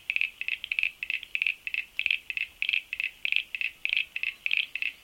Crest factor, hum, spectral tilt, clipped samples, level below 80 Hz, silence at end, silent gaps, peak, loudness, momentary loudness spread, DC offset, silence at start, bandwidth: 24 dB; none; 1.5 dB/octave; under 0.1%; -68 dBFS; 0.05 s; none; -8 dBFS; -29 LUFS; 5 LU; under 0.1%; 0.1 s; 17 kHz